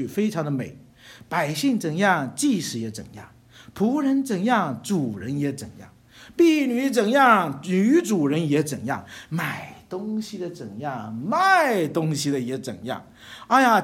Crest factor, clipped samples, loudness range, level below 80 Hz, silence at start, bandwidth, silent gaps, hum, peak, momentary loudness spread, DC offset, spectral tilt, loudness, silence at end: 18 dB; under 0.1%; 5 LU; -64 dBFS; 0 s; 16.5 kHz; none; none; -4 dBFS; 16 LU; under 0.1%; -5 dB/octave; -23 LUFS; 0 s